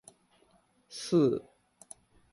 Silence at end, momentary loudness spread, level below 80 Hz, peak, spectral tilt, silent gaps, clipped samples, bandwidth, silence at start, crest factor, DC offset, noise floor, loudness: 0.9 s; 25 LU; -72 dBFS; -16 dBFS; -6.5 dB/octave; none; under 0.1%; 11.5 kHz; 0.9 s; 18 dB; under 0.1%; -67 dBFS; -30 LUFS